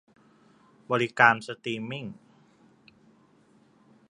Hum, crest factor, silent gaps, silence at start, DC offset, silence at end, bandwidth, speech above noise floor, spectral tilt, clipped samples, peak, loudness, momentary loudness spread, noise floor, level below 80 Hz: none; 28 dB; none; 0.9 s; under 0.1%; 1.95 s; 11 kHz; 35 dB; -5 dB/octave; under 0.1%; -2 dBFS; -25 LUFS; 17 LU; -61 dBFS; -74 dBFS